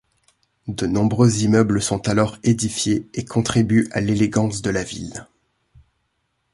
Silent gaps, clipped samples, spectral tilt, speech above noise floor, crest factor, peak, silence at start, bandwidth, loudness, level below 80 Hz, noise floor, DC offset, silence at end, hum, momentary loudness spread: none; under 0.1%; -5.5 dB/octave; 52 dB; 18 dB; -2 dBFS; 0.65 s; 11.5 kHz; -20 LUFS; -46 dBFS; -71 dBFS; under 0.1%; 1.3 s; none; 13 LU